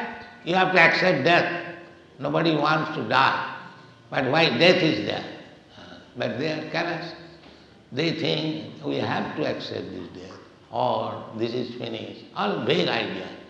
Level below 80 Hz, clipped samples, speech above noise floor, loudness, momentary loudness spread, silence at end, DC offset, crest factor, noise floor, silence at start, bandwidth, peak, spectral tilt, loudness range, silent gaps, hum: -66 dBFS; under 0.1%; 26 dB; -23 LUFS; 20 LU; 0 s; under 0.1%; 20 dB; -50 dBFS; 0 s; 8.6 kHz; -4 dBFS; -5.5 dB/octave; 8 LU; none; none